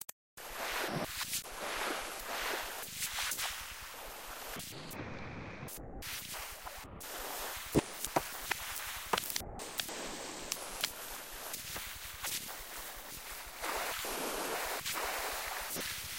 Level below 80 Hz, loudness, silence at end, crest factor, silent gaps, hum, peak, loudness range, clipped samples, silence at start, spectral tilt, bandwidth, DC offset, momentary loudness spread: -58 dBFS; -39 LUFS; 0 s; 26 dB; 0.12-0.37 s; none; -14 dBFS; 5 LU; under 0.1%; 0 s; -2 dB/octave; 17 kHz; under 0.1%; 10 LU